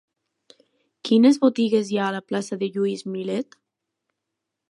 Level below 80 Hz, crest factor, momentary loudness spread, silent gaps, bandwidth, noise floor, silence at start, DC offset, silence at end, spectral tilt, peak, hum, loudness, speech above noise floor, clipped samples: -78 dBFS; 18 dB; 13 LU; none; 11.5 kHz; -82 dBFS; 1.05 s; under 0.1%; 1.25 s; -6 dB/octave; -6 dBFS; none; -22 LUFS; 61 dB; under 0.1%